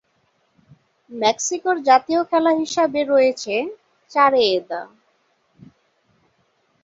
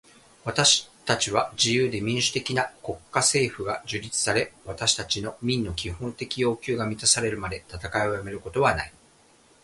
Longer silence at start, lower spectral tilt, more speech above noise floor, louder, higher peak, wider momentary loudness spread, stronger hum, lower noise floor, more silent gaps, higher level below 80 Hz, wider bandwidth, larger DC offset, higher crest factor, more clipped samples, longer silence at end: first, 1.1 s vs 0.45 s; about the same, -2.5 dB/octave vs -2.5 dB/octave; first, 47 dB vs 32 dB; first, -19 LUFS vs -25 LUFS; about the same, -2 dBFS vs -4 dBFS; about the same, 11 LU vs 12 LU; neither; first, -65 dBFS vs -58 dBFS; neither; second, -68 dBFS vs -50 dBFS; second, 7.8 kHz vs 11.5 kHz; neither; about the same, 20 dB vs 22 dB; neither; first, 1.95 s vs 0.75 s